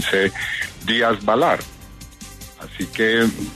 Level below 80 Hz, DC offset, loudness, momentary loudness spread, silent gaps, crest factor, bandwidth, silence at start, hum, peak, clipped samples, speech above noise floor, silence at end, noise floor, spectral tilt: -46 dBFS; under 0.1%; -19 LUFS; 21 LU; none; 16 dB; 13.5 kHz; 0 s; none; -6 dBFS; under 0.1%; 20 dB; 0 s; -39 dBFS; -4 dB/octave